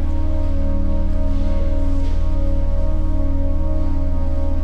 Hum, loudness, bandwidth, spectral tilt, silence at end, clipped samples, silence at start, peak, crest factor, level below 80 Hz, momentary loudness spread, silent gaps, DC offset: none; -23 LUFS; 3.3 kHz; -9.5 dB/octave; 0 s; under 0.1%; 0 s; -8 dBFS; 8 dB; -16 dBFS; 1 LU; none; under 0.1%